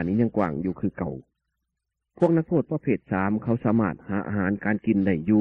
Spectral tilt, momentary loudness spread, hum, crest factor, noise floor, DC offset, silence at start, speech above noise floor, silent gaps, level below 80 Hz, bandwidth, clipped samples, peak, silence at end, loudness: -11 dB/octave; 7 LU; none; 18 dB; -82 dBFS; under 0.1%; 0 s; 58 dB; none; -56 dBFS; 3.9 kHz; under 0.1%; -6 dBFS; 0 s; -25 LUFS